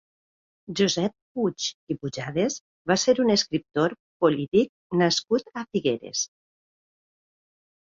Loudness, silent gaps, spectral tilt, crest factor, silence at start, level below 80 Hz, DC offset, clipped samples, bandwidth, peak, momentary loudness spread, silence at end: -25 LUFS; 1.22-1.35 s, 1.74-1.87 s, 2.60-2.85 s, 3.99-4.20 s, 4.48-4.52 s, 4.69-4.90 s; -4 dB/octave; 18 dB; 0.7 s; -64 dBFS; under 0.1%; under 0.1%; 7.8 kHz; -8 dBFS; 9 LU; 1.7 s